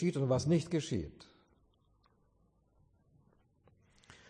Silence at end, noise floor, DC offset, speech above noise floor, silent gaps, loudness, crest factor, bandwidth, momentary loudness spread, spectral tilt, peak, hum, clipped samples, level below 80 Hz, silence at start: 3.05 s; -72 dBFS; under 0.1%; 39 dB; none; -33 LUFS; 18 dB; 10 kHz; 9 LU; -6.5 dB/octave; -20 dBFS; none; under 0.1%; -62 dBFS; 0 s